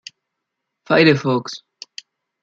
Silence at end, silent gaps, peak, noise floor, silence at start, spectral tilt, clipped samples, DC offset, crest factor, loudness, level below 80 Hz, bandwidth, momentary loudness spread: 0.85 s; none; -2 dBFS; -79 dBFS; 0.9 s; -6 dB/octave; under 0.1%; under 0.1%; 18 dB; -16 LUFS; -64 dBFS; 7.6 kHz; 23 LU